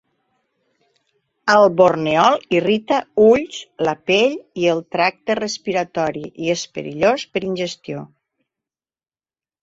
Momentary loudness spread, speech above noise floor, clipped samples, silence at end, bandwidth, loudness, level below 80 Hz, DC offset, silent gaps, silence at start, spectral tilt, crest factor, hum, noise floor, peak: 11 LU; over 72 dB; under 0.1%; 1.55 s; 8 kHz; -18 LUFS; -58 dBFS; under 0.1%; none; 1.45 s; -4.5 dB/octave; 18 dB; none; under -90 dBFS; -2 dBFS